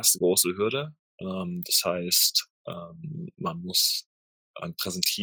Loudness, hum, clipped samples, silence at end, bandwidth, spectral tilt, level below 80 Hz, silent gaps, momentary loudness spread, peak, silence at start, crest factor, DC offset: -25 LUFS; none; under 0.1%; 0 s; over 20 kHz; -2 dB/octave; -74 dBFS; 0.99-1.18 s, 2.50-2.65 s, 4.06-4.54 s; 19 LU; -6 dBFS; 0 s; 22 dB; under 0.1%